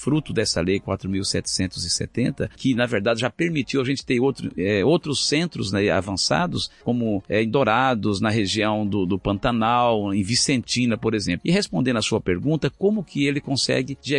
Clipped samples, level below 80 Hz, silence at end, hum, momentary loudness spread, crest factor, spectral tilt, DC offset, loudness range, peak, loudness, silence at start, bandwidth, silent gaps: under 0.1%; -48 dBFS; 0 s; none; 5 LU; 16 dB; -4.5 dB/octave; under 0.1%; 2 LU; -6 dBFS; -22 LUFS; 0 s; 11.5 kHz; none